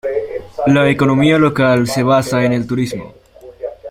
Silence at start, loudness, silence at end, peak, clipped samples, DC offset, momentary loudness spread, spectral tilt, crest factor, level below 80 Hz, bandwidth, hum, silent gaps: 0.05 s; -14 LUFS; 0 s; 0 dBFS; under 0.1%; under 0.1%; 16 LU; -6.5 dB/octave; 14 dB; -46 dBFS; 16 kHz; none; none